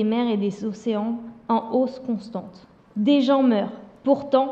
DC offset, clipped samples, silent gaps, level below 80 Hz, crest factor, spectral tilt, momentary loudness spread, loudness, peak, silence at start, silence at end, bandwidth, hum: under 0.1%; under 0.1%; none; -66 dBFS; 16 dB; -7.5 dB/octave; 14 LU; -23 LUFS; -6 dBFS; 0 s; 0 s; 7.8 kHz; none